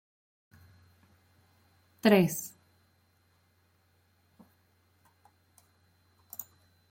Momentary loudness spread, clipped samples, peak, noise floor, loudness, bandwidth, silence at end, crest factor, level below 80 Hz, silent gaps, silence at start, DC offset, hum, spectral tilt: 21 LU; under 0.1%; -8 dBFS; -69 dBFS; -29 LUFS; 16.5 kHz; 0.5 s; 28 dB; -78 dBFS; none; 2.05 s; under 0.1%; none; -5.5 dB/octave